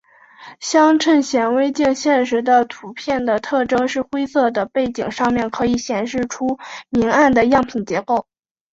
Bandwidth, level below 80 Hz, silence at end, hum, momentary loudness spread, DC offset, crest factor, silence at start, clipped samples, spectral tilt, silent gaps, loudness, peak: 8 kHz; -50 dBFS; 0.5 s; none; 9 LU; under 0.1%; 16 dB; 0.4 s; under 0.1%; -4.5 dB/octave; none; -18 LUFS; -2 dBFS